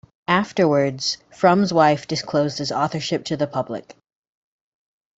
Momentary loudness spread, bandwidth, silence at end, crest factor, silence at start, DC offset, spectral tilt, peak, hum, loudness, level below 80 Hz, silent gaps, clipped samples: 8 LU; 8 kHz; 1.25 s; 20 dB; 0.3 s; under 0.1%; -5 dB/octave; -2 dBFS; none; -20 LUFS; -60 dBFS; none; under 0.1%